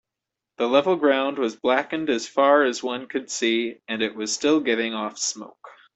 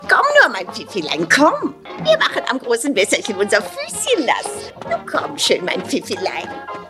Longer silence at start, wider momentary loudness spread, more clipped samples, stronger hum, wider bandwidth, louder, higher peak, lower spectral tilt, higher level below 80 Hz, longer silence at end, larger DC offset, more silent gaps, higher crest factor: first, 0.6 s vs 0 s; second, 10 LU vs 13 LU; neither; neither; second, 8.4 kHz vs 14.5 kHz; second, -23 LUFS vs -17 LUFS; second, -4 dBFS vs 0 dBFS; about the same, -2.5 dB/octave vs -2.5 dB/octave; second, -70 dBFS vs -60 dBFS; first, 0.25 s vs 0 s; neither; neither; about the same, 20 dB vs 18 dB